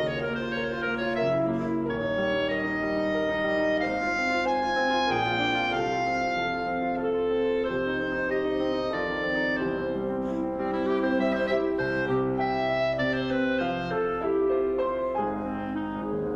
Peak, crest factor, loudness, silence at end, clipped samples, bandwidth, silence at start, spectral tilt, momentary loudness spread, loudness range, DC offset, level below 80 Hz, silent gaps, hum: -14 dBFS; 14 dB; -27 LUFS; 0 s; under 0.1%; 8.2 kHz; 0 s; -6 dB/octave; 4 LU; 2 LU; under 0.1%; -52 dBFS; none; none